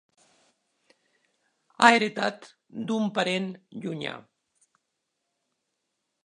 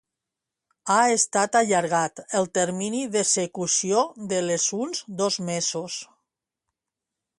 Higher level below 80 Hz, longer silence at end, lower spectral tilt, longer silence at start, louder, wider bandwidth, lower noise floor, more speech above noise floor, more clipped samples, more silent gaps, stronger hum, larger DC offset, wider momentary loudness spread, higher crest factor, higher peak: about the same, -76 dBFS vs -72 dBFS; first, 2.05 s vs 1.35 s; first, -4 dB/octave vs -2.5 dB/octave; first, 1.8 s vs 0.85 s; about the same, -25 LUFS vs -23 LUFS; about the same, 11.5 kHz vs 11.5 kHz; second, -80 dBFS vs -86 dBFS; second, 55 dB vs 63 dB; neither; neither; neither; neither; first, 21 LU vs 8 LU; first, 28 dB vs 18 dB; first, -2 dBFS vs -6 dBFS